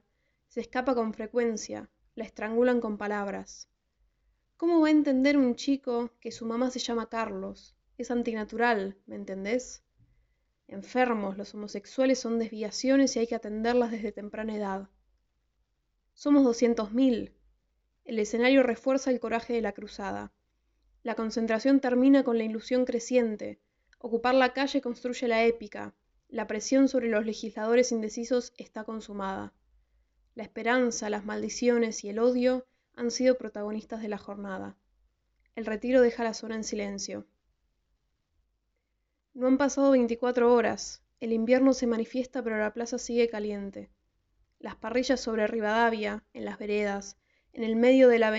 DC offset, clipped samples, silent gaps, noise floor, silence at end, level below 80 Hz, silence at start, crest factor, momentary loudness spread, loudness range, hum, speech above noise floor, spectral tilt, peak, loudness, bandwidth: under 0.1%; under 0.1%; none; -79 dBFS; 0 s; -62 dBFS; 0.55 s; 20 dB; 16 LU; 6 LU; none; 52 dB; -3.5 dB/octave; -10 dBFS; -28 LUFS; 8 kHz